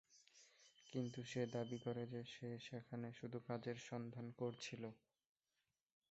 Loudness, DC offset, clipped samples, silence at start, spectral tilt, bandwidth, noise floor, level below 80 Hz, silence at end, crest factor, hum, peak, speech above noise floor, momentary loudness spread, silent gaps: -49 LUFS; under 0.1%; under 0.1%; 0.1 s; -6 dB/octave; 8 kHz; under -90 dBFS; -84 dBFS; 1.15 s; 20 dB; none; -30 dBFS; over 41 dB; 21 LU; none